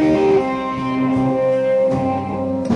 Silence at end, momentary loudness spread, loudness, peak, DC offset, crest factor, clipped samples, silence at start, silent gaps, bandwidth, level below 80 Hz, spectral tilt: 0 s; 6 LU; -18 LUFS; -4 dBFS; under 0.1%; 12 dB; under 0.1%; 0 s; none; 10.5 kHz; -46 dBFS; -8 dB/octave